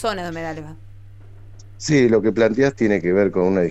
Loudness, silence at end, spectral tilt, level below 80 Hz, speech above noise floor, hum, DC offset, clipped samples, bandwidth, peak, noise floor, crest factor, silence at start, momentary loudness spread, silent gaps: -19 LUFS; 0 s; -6 dB/octave; -46 dBFS; 22 dB; none; under 0.1%; under 0.1%; 8.8 kHz; -6 dBFS; -40 dBFS; 14 dB; 0 s; 14 LU; none